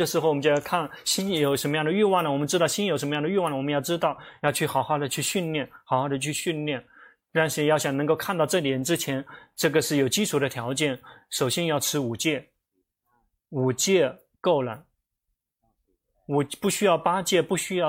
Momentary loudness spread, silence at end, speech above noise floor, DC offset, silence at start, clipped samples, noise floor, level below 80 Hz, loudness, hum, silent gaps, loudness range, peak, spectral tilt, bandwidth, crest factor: 7 LU; 0 s; 56 dB; under 0.1%; 0 s; under 0.1%; -80 dBFS; -66 dBFS; -25 LUFS; none; none; 4 LU; -8 dBFS; -4 dB/octave; 16.5 kHz; 18 dB